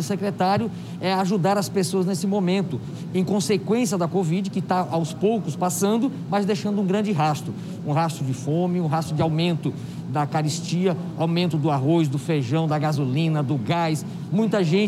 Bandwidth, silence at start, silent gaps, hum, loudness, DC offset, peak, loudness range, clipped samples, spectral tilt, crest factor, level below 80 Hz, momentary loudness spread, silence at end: 15 kHz; 0 s; none; none; -23 LUFS; under 0.1%; -8 dBFS; 1 LU; under 0.1%; -6 dB/octave; 16 dB; -62 dBFS; 5 LU; 0 s